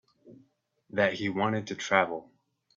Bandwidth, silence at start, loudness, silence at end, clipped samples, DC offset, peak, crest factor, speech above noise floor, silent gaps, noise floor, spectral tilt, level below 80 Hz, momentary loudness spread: 7.8 kHz; 0.25 s; -29 LUFS; 0.55 s; under 0.1%; under 0.1%; -6 dBFS; 26 dB; 39 dB; none; -67 dBFS; -5 dB/octave; -72 dBFS; 9 LU